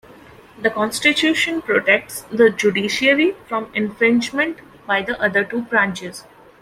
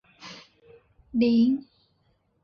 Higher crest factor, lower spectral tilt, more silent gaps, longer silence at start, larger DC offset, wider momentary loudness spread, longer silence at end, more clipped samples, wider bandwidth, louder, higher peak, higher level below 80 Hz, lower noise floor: about the same, 18 dB vs 14 dB; second, -3.5 dB/octave vs -7 dB/octave; neither; first, 0.6 s vs 0.25 s; neither; second, 9 LU vs 23 LU; second, 0.4 s vs 0.85 s; neither; first, 16 kHz vs 6.6 kHz; first, -18 LUFS vs -24 LUFS; first, -2 dBFS vs -12 dBFS; first, -56 dBFS vs -64 dBFS; second, -44 dBFS vs -69 dBFS